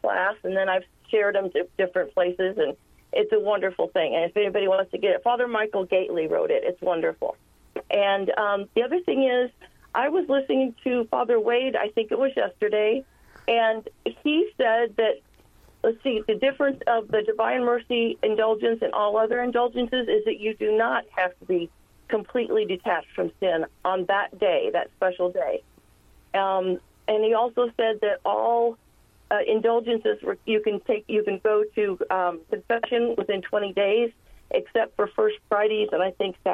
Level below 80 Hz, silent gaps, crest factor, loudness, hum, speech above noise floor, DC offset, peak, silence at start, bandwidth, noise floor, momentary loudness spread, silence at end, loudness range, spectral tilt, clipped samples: -62 dBFS; none; 16 dB; -24 LUFS; none; 32 dB; under 0.1%; -10 dBFS; 0.05 s; 4.3 kHz; -56 dBFS; 5 LU; 0 s; 2 LU; -6.5 dB/octave; under 0.1%